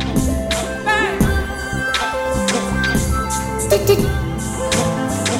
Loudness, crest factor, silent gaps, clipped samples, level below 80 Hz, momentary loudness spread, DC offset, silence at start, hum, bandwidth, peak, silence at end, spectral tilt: -18 LUFS; 16 dB; none; under 0.1%; -26 dBFS; 6 LU; under 0.1%; 0 s; none; 16.5 kHz; -2 dBFS; 0 s; -4.5 dB/octave